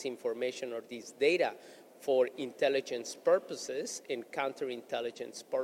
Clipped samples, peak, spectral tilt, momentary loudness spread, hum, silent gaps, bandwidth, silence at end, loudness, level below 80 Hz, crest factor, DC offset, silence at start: under 0.1%; -16 dBFS; -3 dB/octave; 10 LU; none; none; 16 kHz; 0 s; -34 LUFS; -86 dBFS; 18 dB; under 0.1%; 0 s